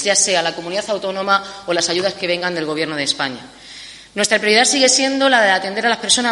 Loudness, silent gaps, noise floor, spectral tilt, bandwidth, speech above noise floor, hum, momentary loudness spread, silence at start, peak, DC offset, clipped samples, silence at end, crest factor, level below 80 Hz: -16 LUFS; none; -37 dBFS; -1.5 dB/octave; 11.5 kHz; 20 dB; none; 12 LU; 0 s; 0 dBFS; under 0.1%; under 0.1%; 0 s; 18 dB; -60 dBFS